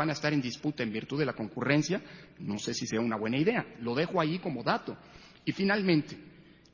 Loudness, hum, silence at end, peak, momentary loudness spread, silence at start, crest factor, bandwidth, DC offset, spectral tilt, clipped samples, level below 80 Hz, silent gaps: -31 LUFS; none; 0.35 s; -12 dBFS; 10 LU; 0 s; 20 dB; 7.4 kHz; under 0.1%; -5.5 dB/octave; under 0.1%; -66 dBFS; none